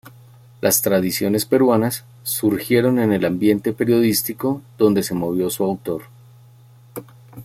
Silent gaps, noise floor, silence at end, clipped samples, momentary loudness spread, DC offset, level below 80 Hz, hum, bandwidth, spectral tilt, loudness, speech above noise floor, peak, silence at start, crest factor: none; -47 dBFS; 0 s; under 0.1%; 12 LU; under 0.1%; -56 dBFS; none; 16.5 kHz; -5 dB/octave; -19 LUFS; 29 dB; -2 dBFS; 0.05 s; 16 dB